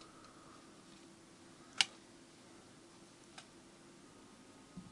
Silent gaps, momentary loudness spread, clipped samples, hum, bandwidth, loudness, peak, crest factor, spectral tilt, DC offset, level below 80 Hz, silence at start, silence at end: none; 24 LU; under 0.1%; none; 11.5 kHz; -36 LUFS; -10 dBFS; 40 dB; -0.5 dB/octave; under 0.1%; -78 dBFS; 0 s; 0 s